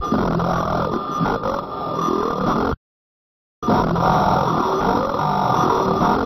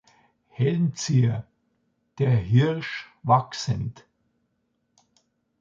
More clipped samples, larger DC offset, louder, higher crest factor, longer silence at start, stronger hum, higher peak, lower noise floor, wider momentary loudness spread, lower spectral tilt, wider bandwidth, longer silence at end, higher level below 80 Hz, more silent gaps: neither; neither; first, -20 LUFS vs -24 LUFS; second, 16 dB vs 22 dB; second, 0 s vs 0.6 s; neither; about the same, -4 dBFS vs -4 dBFS; first, under -90 dBFS vs -74 dBFS; second, 7 LU vs 12 LU; about the same, -7 dB/octave vs -6.5 dB/octave; first, 15.5 kHz vs 7.4 kHz; second, 0 s vs 1.6 s; first, -38 dBFS vs -54 dBFS; first, 2.77-3.62 s vs none